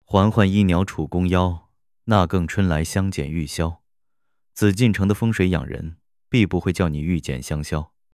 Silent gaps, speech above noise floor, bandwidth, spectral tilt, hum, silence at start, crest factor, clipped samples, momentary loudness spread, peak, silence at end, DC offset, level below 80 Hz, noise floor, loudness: none; 62 dB; 15 kHz; -6.5 dB/octave; none; 0.1 s; 20 dB; under 0.1%; 11 LU; 0 dBFS; 0.3 s; under 0.1%; -34 dBFS; -82 dBFS; -21 LUFS